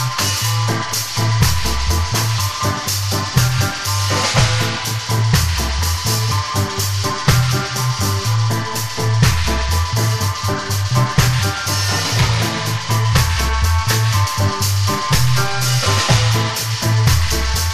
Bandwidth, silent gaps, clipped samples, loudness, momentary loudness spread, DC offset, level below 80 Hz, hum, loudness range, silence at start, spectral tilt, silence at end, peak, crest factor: 15.5 kHz; none; under 0.1%; -17 LUFS; 4 LU; under 0.1%; -28 dBFS; none; 2 LU; 0 s; -3.5 dB/octave; 0 s; -2 dBFS; 16 dB